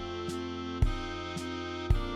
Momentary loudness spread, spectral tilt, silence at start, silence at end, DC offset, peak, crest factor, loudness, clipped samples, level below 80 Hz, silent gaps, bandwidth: 5 LU; -6 dB/octave; 0 s; 0 s; under 0.1%; -14 dBFS; 20 dB; -35 LUFS; under 0.1%; -36 dBFS; none; 12.5 kHz